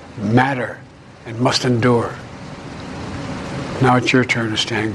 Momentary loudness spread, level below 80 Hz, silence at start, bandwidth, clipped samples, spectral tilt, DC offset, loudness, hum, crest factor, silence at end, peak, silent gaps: 17 LU; -46 dBFS; 0 s; 12 kHz; under 0.1%; -5.5 dB/octave; under 0.1%; -18 LUFS; none; 18 dB; 0 s; -2 dBFS; none